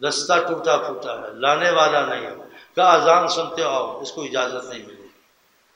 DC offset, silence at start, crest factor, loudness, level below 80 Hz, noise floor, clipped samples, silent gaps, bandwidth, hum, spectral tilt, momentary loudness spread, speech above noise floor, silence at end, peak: under 0.1%; 0 s; 20 dB; -20 LUFS; -74 dBFS; -60 dBFS; under 0.1%; none; 16 kHz; none; -2.5 dB/octave; 16 LU; 40 dB; 0.7 s; 0 dBFS